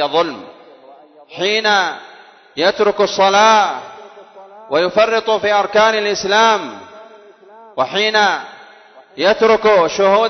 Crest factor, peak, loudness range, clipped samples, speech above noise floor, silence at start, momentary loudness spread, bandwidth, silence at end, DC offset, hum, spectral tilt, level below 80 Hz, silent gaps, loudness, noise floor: 16 dB; 0 dBFS; 3 LU; under 0.1%; 29 dB; 0 s; 19 LU; 6.4 kHz; 0 s; under 0.1%; none; -2.5 dB/octave; -56 dBFS; none; -14 LUFS; -43 dBFS